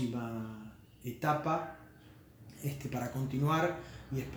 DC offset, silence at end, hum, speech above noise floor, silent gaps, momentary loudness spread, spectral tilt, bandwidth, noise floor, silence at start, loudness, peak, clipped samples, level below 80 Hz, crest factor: under 0.1%; 0 s; none; 23 dB; none; 22 LU; -6.5 dB/octave; over 20 kHz; -57 dBFS; 0 s; -36 LUFS; -18 dBFS; under 0.1%; -60 dBFS; 18 dB